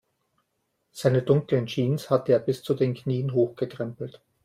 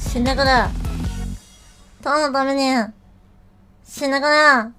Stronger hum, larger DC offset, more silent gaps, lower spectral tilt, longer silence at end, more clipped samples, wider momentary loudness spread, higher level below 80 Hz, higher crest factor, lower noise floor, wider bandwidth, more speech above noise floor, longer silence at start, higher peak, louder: neither; neither; neither; first, -7.5 dB/octave vs -4.5 dB/octave; first, 0.35 s vs 0.05 s; neither; second, 11 LU vs 18 LU; second, -64 dBFS vs -32 dBFS; about the same, 18 dB vs 20 dB; first, -76 dBFS vs -50 dBFS; about the same, 15 kHz vs 16 kHz; first, 51 dB vs 33 dB; first, 0.95 s vs 0 s; second, -8 dBFS vs 0 dBFS; second, -25 LUFS vs -18 LUFS